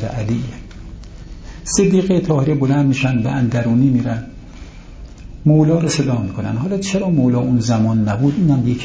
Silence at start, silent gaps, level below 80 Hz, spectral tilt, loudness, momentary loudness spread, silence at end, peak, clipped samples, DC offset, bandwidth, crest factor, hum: 0 s; none; -38 dBFS; -6.5 dB/octave; -16 LUFS; 22 LU; 0 s; -2 dBFS; under 0.1%; under 0.1%; 8 kHz; 14 dB; none